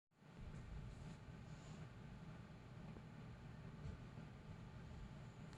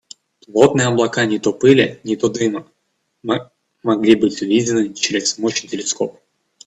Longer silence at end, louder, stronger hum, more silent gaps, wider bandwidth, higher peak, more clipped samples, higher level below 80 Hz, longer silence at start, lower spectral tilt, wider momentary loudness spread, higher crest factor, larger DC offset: second, 0 s vs 0.55 s; second, -57 LUFS vs -17 LUFS; neither; neither; first, 11 kHz vs 8.6 kHz; second, -42 dBFS vs 0 dBFS; neither; second, -62 dBFS vs -56 dBFS; second, 0.15 s vs 0.5 s; first, -7 dB/octave vs -4.5 dB/octave; second, 3 LU vs 10 LU; about the same, 14 dB vs 18 dB; neither